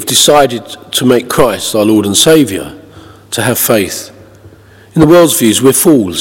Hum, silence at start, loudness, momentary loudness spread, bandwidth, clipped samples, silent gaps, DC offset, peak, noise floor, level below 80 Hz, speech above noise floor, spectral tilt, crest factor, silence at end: none; 0 s; -9 LUFS; 13 LU; over 20 kHz; 2%; none; under 0.1%; 0 dBFS; -38 dBFS; -40 dBFS; 29 dB; -3.5 dB/octave; 10 dB; 0 s